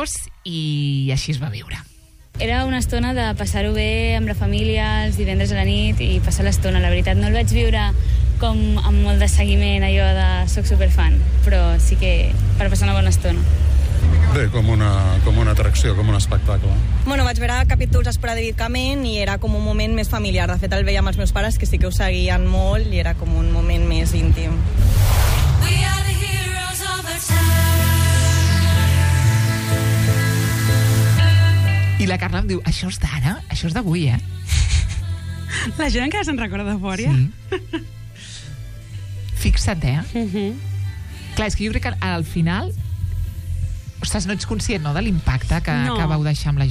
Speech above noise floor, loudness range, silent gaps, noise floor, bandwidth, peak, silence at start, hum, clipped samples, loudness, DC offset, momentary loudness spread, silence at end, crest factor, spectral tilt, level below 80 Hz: 20 dB; 7 LU; none; -37 dBFS; 15.5 kHz; -4 dBFS; 0 s; none; under 0.1%; -19 LUFS; under 0.1%; 10 LU; 0 s; 12 dB; -5.5 dB/octave; -20 dBFS